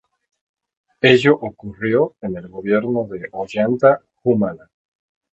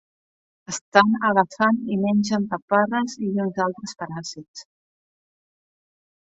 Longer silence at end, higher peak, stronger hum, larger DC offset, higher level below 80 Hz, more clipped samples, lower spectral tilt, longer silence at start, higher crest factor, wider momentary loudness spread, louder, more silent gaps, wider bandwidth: second, 0.75 s vs 1.75 s; about the same, 0 dBFS vs 0 dBFS; neither; neither; first, -56 dBFS vs -66 dBFS; neither; first, -7 dB/octave vs -5 dB/octave; first, 1.05 s vs 0.7 s; about the same, 20 dB vs 24 dB; about the same, 14 LU vs 15 LU; first, -18 LUFS vs -22 LUFS; second, none vs 0.81-0.92 s, 2.62-2.68 s, 4.48-4.54 s; about the same, 8.2 kHz vs 8 kHz